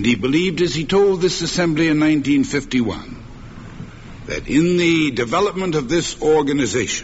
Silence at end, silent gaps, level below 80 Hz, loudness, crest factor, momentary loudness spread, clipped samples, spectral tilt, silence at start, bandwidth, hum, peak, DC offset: 0 s; none; -40 dBFS; -18 LUFS; 14 dB; 21 LU; under 0.1%; -5 dB/octave; 0 s; 8 kHz; none; -4 dBFS; under 0.1%